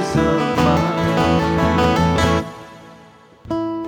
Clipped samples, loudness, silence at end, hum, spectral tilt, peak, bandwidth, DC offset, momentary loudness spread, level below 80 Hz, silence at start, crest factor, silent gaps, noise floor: under 0.1%; -17 LUFS; 0 s; none; -6 dB/octave; -2 dBFS; 18 kHz; under 0.1%; 9 LU; -34 dBFS; 0 s; 16 dB; none; -45 dBFS